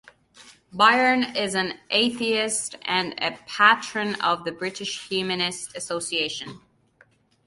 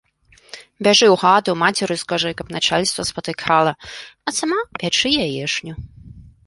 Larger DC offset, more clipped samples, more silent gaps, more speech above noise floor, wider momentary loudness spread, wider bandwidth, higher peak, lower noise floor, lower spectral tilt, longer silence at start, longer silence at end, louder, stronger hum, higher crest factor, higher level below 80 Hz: neither; neither; neither; about the same, 36 dB vs 34 dB; second, 12 LU vs 20 LU; about the same, 11.5 kHz vs 11.5 kHz; about the same, -2 dBFS vs -2 dBFS; first, -60 dBFS vs -53 dBFS; about the same, -2 dB/octave vs -3 dB/octave; second, 0.4 s vs 0.55 s; first, 0.9 s vs 0.25 s; second, -23 LUFS vs -18 LUFS; neither; first, 24 dB vs 18 dB; second, -66 dBFS vs -50 dBFS